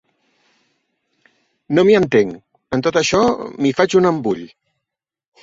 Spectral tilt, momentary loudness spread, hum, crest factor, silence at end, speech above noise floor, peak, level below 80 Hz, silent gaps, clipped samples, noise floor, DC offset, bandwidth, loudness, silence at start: -5 dB/octave; 10 LU; none; 18 dB; 0.95 s; 68 dB; -2 dBFS; -52 dBFS; none; under 0.1%; -83 dBFS; under 0.1%; 8 kHz; -16 LUFS; 1.7 s